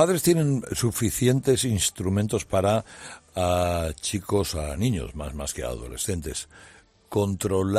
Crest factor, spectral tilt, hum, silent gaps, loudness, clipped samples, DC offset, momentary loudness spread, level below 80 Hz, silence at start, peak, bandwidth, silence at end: 20 dB; -5 dB/octave; none; none; -25 LUFS; under 0.1%; under 0.1%; 11 LU; -44 dBFS; 0 s; -6 dBFS; 15.5 kHz; 0 s